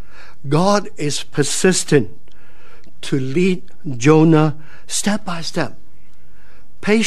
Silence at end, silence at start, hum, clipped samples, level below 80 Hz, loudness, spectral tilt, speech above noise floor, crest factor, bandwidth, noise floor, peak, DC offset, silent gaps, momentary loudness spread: 0 s; 0.45 s; none; under 0.1%; -52 dBFS; -17 LUFS; -5 dB/octave; 35 dB; 18 dB; 13.5 kHz; -51 dBFS; 0 dBFS; 8%; none; 14 LU